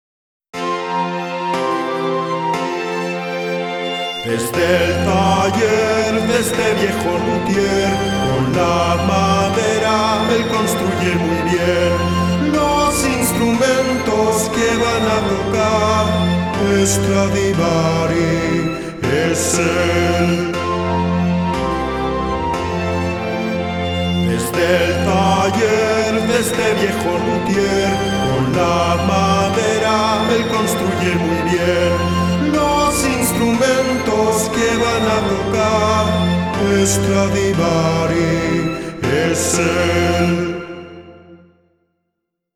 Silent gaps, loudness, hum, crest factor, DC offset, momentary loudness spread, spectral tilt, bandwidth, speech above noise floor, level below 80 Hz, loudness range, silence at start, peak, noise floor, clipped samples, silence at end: none; -16 LUFS; none; 14 dB; under 0.1%; 5 LU; -5 dB/octave; 17.5 kHz; 60 dB; -36 dBFS; 3 LU; 0.55 s; -2 dBFS; -75 dBFS; under 0.1%; 1.2 s